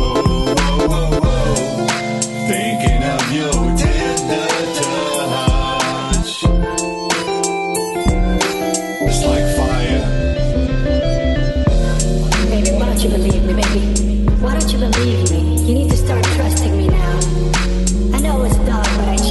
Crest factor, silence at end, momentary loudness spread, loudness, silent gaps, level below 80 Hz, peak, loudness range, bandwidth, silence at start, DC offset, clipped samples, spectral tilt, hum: 12 dB; 0 s; 3 LU; -16 LUFS; none; -18 dBFS; -2 dBFS; 2 LU; 12 kHz; 0 s; under 0.1%; under 0.1%; -5 dB/octave; none